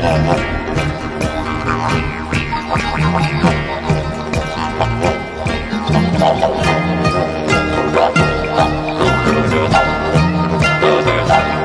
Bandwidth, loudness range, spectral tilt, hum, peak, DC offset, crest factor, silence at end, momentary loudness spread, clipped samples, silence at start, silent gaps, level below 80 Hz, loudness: 11 kHz; 3 LU; -6 dB/octave; none; 0 dBFS; under 0.1%; 14 dB; 0 s; 7 LU; under 0.1%; 0 s; none; -28 dBFS; -15 LUFS